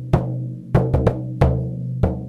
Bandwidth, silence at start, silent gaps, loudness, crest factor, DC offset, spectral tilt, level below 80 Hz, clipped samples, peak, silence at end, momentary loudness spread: 6.6 kHz; 0 s; none; -21 LUFS; 14 dB; under 0.1%; -9.5 dB/octave; -28 dBFS; under 0.1%; -6 dBFS; 0 s; 8 LU